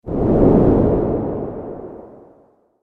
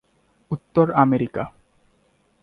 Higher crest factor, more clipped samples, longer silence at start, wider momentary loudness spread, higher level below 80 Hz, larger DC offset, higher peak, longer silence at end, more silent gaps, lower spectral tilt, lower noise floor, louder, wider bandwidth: about the same, 18 dB vs 20 dB; neither; second, 0.05 s vs 0.5 s; first, 20 LU vs 15 LU; first, -30 dBFS vs -56 dBFS; neither; about the same, 0 dBFS vs -2 dBFS; second, 0.75 s vs 0.95 s; neither; first, -12.5 dB/octave vs -10.5 dB/octave; second, -54 dBFS vs -63 dBFS; first, -16 LUFS vs -21 LUFS; second, 4.1 kHz vs 4.9 kHz